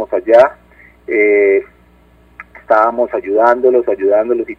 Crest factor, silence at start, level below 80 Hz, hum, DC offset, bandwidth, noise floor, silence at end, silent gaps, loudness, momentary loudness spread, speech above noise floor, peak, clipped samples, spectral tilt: 14 dB; 0 s; -50 dBFS; 60 Hz at -50 dBFS; under 0.1%; 6.2 kHz; -47 dBFS; 0.05 s; none; -12 LUFS; 6 LU; 35 dB; 0 dBFS; under 0.1%; -6.5 dB/octave